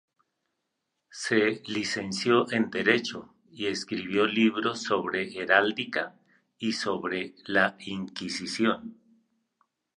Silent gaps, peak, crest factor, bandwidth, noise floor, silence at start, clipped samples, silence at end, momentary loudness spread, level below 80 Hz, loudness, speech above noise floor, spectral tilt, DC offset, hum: none; -6 dBFS; 22 dB; 11 kHz; -81 dBFS; 1.15 s; under 0.1%; 1.05 s; 12 LU; -70 dBFS; -27 LUFS; 54 dB; -4 dB/octave; under 0.1%; none